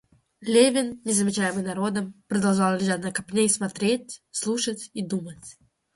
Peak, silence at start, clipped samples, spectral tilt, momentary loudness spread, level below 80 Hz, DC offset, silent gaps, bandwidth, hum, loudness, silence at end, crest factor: -6 dBFS; 0.4 s; under 0.1%; -4 dB/octave; 11 LU; -64 dBFS; under 0.1%; none; 11.5 kHz; none; -24 LUFS; 0.45 s; 20 dB